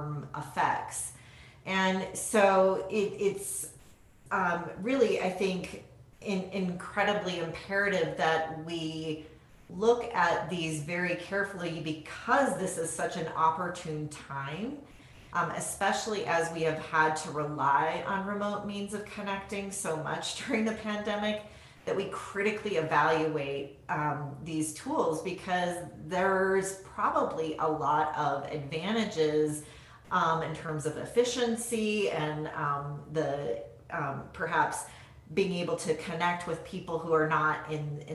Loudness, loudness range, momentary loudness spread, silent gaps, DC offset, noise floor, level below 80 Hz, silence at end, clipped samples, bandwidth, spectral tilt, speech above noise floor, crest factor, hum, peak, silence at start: -31 LUFS; 4 LU; 10 LU; none; under 0.1%; -57 dBFS; -62 dBFS; 0 s; under 0.1%; 13 kHz; -4.5 dB/octave; 26 dB; 20 dB; none; -12 dBFS; 0 s